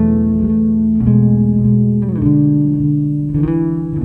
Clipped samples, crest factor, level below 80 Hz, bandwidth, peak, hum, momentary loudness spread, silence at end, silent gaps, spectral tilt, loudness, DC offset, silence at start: under 0.1%; 12 dB; -32 dBFS; 2.6 kHz; -2 dBFS; none; 5 LU; 0 s; none; -13 dB/octave; -14 LUFS; under 0.1%; 0 s